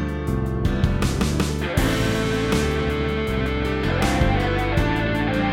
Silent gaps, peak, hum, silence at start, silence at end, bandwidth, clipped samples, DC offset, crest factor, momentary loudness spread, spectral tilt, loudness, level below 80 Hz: none; -6 dBFS; none; 0 s; 0 s; 16.5 kHz; under 0.1%; under 0.1%; 16 dB; 3 LU; -6 dB/octave; -22 LUFS; -28 dBFS